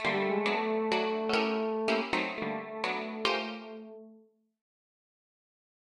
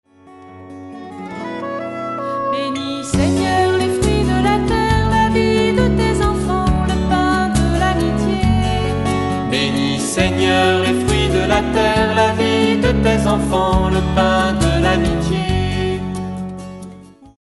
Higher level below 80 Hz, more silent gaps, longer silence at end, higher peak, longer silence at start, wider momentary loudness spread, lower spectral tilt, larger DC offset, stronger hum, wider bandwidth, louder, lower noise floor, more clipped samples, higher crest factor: second, -70 dBFS vs -26 dBFS; neither; first, 1.8 s vs 0.35 s; second, -12 dBFS vs 0 dBFS; second, 0 s vs 0.25 s; first, 14 LU vs 11 LU; about the same, -4.5 dB/octave vs -5.5 dB/octave; neither; neither; about the same, 11.5 kHz vs 11.5 kHz; second, -31 LUFS vs -16 LUFS; first, -61 dBFS vs -41 dBFS; neither; first, 22 dB vs 16 dB